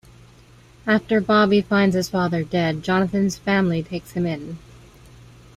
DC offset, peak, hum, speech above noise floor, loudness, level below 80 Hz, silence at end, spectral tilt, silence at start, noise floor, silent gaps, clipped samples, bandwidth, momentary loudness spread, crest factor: under 0.1%; -6 dBFS; none; 29 dB; -21 LUFS; -52 dBFS; 1 s; -6 dB/octave; 0.85 s; -49 dBFS; none; under 0.1%; 14 kHz; 12 LU; 16 dB